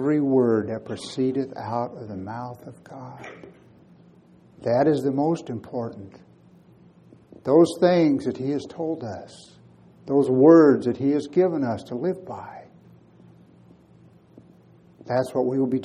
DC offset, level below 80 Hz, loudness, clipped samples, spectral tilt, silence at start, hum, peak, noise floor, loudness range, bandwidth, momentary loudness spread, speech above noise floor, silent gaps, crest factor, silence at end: under 0.1%; -66 dBFS; -22 LUFS; under 0.1%; -7.5 dB/octave; 0 s; none; -2 dBFS; -53 dBFS; 13 LU; 11 kHz; 21 LU; 31 dB; none; 22 dB; 0 s